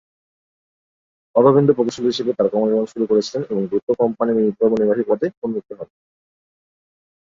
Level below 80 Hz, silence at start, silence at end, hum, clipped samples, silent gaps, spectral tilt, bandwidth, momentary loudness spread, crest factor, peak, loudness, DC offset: -62 dBFS; 1.35 s; 1.55 s; none; under 0.1%; 3.83-3.87 s, 5.37-5.42 s; -7 dB/octave; 7.6 kHz; 12 LU; 18 dB; -2 dBFS; -18 LUFS; under 0.1%